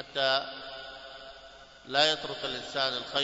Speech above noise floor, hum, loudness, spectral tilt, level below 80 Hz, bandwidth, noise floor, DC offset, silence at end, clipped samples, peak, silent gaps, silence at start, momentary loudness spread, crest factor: 21 dB; none; -29 LUFS; -2 dB/octave; -64 dBFS; 8 kHz; -51 dBFS; under 0.1%; 0 s; under 0.1%; -10 dBFS; none; 0 s; 22 LU; 22 dB